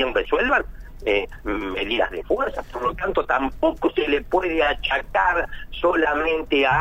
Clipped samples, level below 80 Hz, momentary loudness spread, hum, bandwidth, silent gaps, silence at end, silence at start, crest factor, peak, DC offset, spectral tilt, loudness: under 0.1%; -38 dBFS; 7 LU; none; 16 kHz; none; 0 s; 0 s; 16 dB; -6 dBFS; under 0.1%; -5.5 dB/octave; -22 LUFS